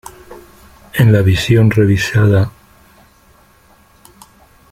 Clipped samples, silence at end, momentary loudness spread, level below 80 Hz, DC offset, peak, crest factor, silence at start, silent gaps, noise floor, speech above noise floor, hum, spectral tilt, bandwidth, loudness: under 0.1%; 2.2 s; 12 LU; -40 dBFS; under 0.1%; 0 dBFS; 14 dB; 0.3 s; none; -48 dBFS; 38 dB; none; -6.5 dB/octave; 15 kHz; -12 LUFS